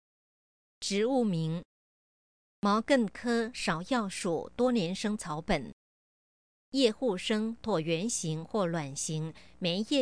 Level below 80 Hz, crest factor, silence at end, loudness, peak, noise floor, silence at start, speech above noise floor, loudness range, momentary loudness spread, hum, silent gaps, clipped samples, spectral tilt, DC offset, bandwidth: -58 dBFS; 20 dB; 0 s; -31 LUFS; -12 dBFS; under -90 dBFS; 0.8 s; over 60 dB; 2 LU; 8 LU; none; 1.65-2.62 s, 5.73-6.72 s; under 0.1%; -4.5 dB/octave; 0.1%; 10.5 kHz